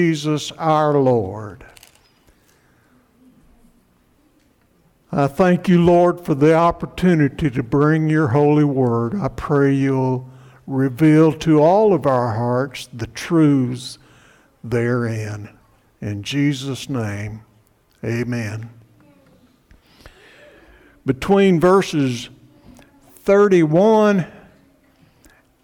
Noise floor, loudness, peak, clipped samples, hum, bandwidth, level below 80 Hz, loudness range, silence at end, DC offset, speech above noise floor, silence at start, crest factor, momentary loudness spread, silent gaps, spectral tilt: -58 dBFS; -17 LUFS; -6 dBFS; under 0.1%; none; 16 kHz; -48 dBFS; 12 LU; 1.35 s; under 0.1%; 41 dB; 0 s; 12 dB; 16 LU; none; -7.5 dB/octave